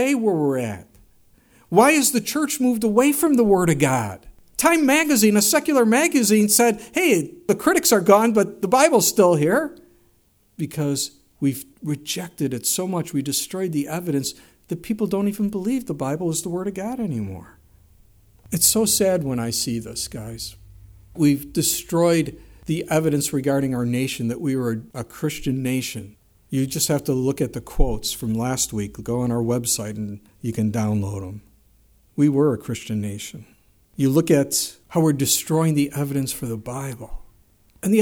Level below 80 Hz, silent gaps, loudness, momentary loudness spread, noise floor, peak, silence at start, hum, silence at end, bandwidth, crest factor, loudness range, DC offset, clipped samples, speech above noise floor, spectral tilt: -40 dBFS; none; -21 LUFS; 15 LU; -60 dBFS; -2 dBFS; 0 s; none; 0 s; over 20 kHz; 20 dB; 8 LU; under 0.1%; under 0.1%; 40 dB; -4.5 dB/octave